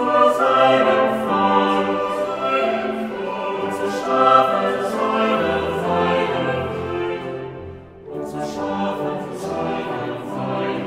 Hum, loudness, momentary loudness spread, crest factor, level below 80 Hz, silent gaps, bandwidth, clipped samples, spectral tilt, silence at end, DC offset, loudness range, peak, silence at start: none; -20 LUFS; 13 LU; 18 dB; -56 dBFS; none; 15.5 kHz; under 0.1%; -5.5 dB/octave; 0 s; under 0.1%; 8 LU; -2 dBFS; 0 s